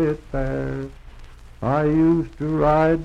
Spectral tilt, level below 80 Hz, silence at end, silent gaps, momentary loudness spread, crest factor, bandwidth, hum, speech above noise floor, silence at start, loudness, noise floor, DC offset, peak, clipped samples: -9 dB/octave; -36 dBFS; 0 s; none; 12 LU; 16 dB; 7.4 kHz; none; 21 dB; 0 s; -21 LUFS; -41 dBFS; under 0.1%; -6 dBFS; under 0.1%